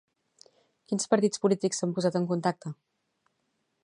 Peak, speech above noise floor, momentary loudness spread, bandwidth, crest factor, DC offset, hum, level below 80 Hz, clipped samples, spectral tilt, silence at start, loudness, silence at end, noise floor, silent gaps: -8 dBFS; 50 dB; 14 LU; 11 kHz; 22 dB; under 0.1%; none; -78 dBFS; under 0.1%; -5 dB/octave; 0.9 s; -28 LUFS; 1.1 s; -77 dBFS; none